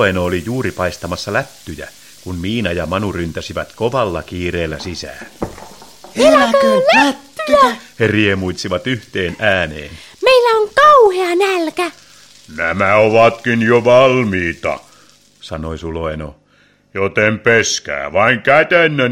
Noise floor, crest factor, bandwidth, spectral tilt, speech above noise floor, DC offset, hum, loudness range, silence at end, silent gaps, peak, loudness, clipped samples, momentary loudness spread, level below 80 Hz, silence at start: -53 dBFS; 14 dB; 16.5 kHz; -4.5 dB/octave; 38 dB; 0.3%; none; 8 LU; 0 s; none; 0 dBFS; -14 LUFS; under 0.1%; 18 LU; -42 dBFS; 0 s